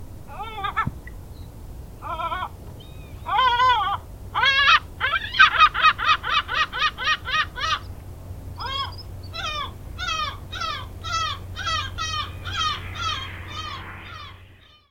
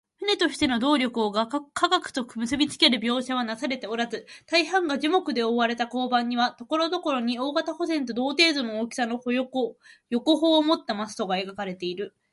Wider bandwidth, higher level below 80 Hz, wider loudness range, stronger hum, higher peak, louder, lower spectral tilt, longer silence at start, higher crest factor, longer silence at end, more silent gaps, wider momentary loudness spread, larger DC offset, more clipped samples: first, 17 kHz vs 11.5 kHz; first, -42 dBFS vs -64 dBFS; first, 11 LU vs 2 LU; neither; first, -2 dBFS vs -6 dBFS; first, -22 LUFS vs -25 LUFS; about the same, -2.5 dB/octave vs -3.5 dB/octave; second, 0 s vs 0.2 s; about the same, 22 dB vs 20 dB; about the same, 0.35 s vs 0.25 s; neither; first, 24 LU vs 10 LU; neither; neither